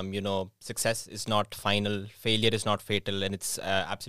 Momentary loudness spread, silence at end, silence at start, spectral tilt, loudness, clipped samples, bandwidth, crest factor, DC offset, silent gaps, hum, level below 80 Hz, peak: 7 LU; 0 s; 0 s; -3.5 dB/octave; -29 LUFS; under 0.1%; 16.5 kHz; 22 dB; 0.5%; none; none; -58 dBFS; -8 dBFS